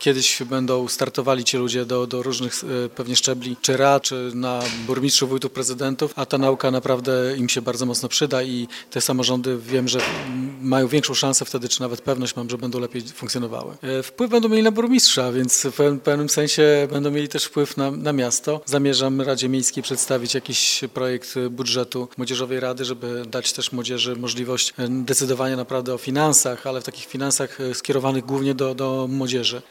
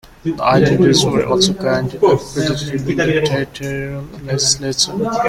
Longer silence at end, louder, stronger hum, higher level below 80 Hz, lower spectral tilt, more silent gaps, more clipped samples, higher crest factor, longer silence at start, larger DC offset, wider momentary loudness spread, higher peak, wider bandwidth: about the same, 0.1 s vs 0 s; second, -21 LUFS vs -16 LUFS; neither; second, -64 dBFS vs -42 dBFS; second, -3 dB/octave vs -4.5 dB/octave; neither; neither; first, 22 dB vs 16 dB; second, 0 s vs 0.25 s; neither; about the same, 10 LU vs 11 LU; about the same, 0 dBFS vs 0 dBFS; about the same, 17 kHz vs 15.5 kHz